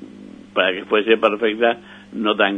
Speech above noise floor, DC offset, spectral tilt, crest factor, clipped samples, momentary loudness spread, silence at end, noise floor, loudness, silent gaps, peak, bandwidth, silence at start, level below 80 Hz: 21 dB; under 0.1%; -6 dB/octave; 20 dB; under 0.1%; 13 LU; 0 s; -40 dBFS; -19 LUFS; none; 0 dBFS; 6.4 kHz; 0 s; -64 dBFS